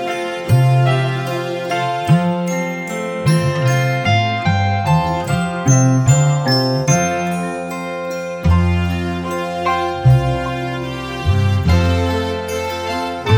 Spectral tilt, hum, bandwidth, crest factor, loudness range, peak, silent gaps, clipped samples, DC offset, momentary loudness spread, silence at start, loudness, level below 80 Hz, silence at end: -5.5 dB/octave; none; 18 kHz; 16 dB; 3 LU; 0 dBFS; none; under 0.1%; under 0.1%; 9 LU; 0 s; -17 LUFS; -32 dBFS; 0 s